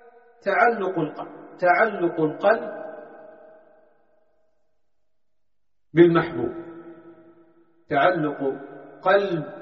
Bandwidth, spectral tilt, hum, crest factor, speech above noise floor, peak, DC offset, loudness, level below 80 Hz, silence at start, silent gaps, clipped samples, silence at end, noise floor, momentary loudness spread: 5.8 kHz; -5 dB/octave; none; 22 dB; 61 dB; -4 dBFS; under 0.1%; -22 LUFS; -64 dBFS; 0.45 s; none; under 0.1%; 0 s; -83 dBFS; 21 LU